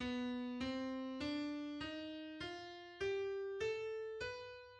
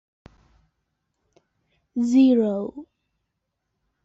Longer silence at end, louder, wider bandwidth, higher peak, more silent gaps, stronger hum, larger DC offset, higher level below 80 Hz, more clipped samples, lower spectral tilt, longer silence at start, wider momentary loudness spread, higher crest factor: second, 0 s vs 1.2 s; second, -44 LUFS vs -20 LUFS; first, 9.8 kHz vs 7.8 kHz; second, -30 dBFS vs -8 dBFS; neither; neither; neither; about the same, -68 dBFS vs -66 dBFS; neither; second, -5 dB/octave vs -7 dB/octave; second, 0 s vs 1.95 s; second, 6 LU vs 18 LU; about the same, 14 dB vs 18 dB